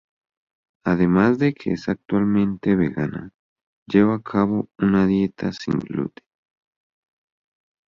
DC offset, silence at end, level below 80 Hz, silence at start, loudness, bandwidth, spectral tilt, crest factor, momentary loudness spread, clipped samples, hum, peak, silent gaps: under 0.1%; 1.85 s; -50 dBFS; 0.85 s; -21 LUFS; 7 kHz; -8.5 dB/octave; 20 dB; 11 LU; under 0.1%; none; -4 dBFS; 3.34-3.56 s, 3.63-3.86 s